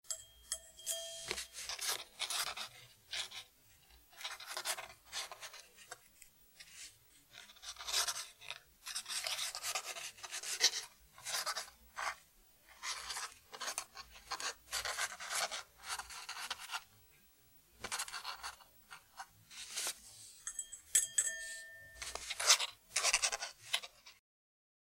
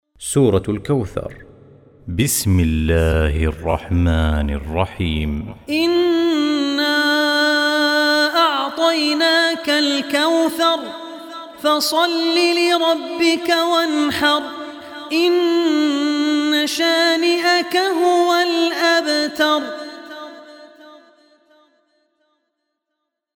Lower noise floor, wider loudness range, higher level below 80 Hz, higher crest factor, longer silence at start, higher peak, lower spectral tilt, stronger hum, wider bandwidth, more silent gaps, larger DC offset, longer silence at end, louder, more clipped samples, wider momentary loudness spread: second, -67 dBFS vs -78 dBFS; first, 11 LU vs 4 LU; second, -72 dBFS vs -32 dBFS; first, 32 dB vs 16 dB; second, 0.05 s vs 0.2 s; second, -12 dBFS vs -2 dBFS; second, 2 dB/octave vs -4.5 dB/octave; neither; second, 16 kHz vs 18 kHz; neither; neither; second, 0.75 s vs 2.45 s; second, -39 LUFS vs -17 LUFS; neither; first, 21 LU vs 12 LU